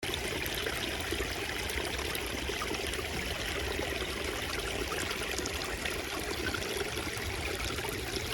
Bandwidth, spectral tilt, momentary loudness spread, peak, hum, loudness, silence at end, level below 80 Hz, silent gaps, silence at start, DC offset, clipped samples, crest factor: 19.5 kHz; -3 dB/octave; 1 LU; -16 dBFS; none; -34 LUFS; 0 s; -46 dBFS; none; 0 s; under 0.1%; under 0.1%; 20 dB